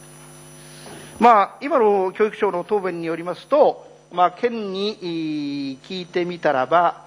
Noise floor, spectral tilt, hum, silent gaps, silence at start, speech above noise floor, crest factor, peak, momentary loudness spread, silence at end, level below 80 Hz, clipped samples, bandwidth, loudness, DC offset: -42 dBFS; -5.5 dB/octave; none; none; 0 s; 23 dB; 20 dB; 0 dBFS; 20 LU; 0.05 s; -64 dBFS; under 0.1%; 10.5 kHz; -20 LUFS; under 0.1%